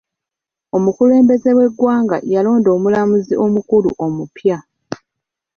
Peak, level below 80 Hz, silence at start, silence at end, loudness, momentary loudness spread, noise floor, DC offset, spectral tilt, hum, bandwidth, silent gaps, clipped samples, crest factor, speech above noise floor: -2 dBFS; -54 dBFS; 0.75 s; 0.6 s; -14 LUFS; 12 LU; -85 dBFS; under 0.1%; -8.5 dB/octave; none; 6.8 kHz; none; under 0.1%; 12 dB; 72 dB